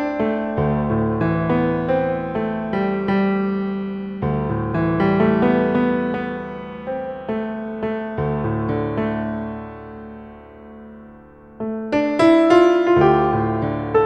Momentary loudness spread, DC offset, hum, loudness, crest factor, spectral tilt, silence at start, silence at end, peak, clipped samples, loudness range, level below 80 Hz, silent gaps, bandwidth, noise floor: 16 LU; under 0.1%; none; -20 LUFS; 20 dB; -8.5 dB/octave; 0 s; 0 s; 0 dBFS; under 0.1%; 8 LU; -42 dBFS; none; 9 kHz; -43 dBFS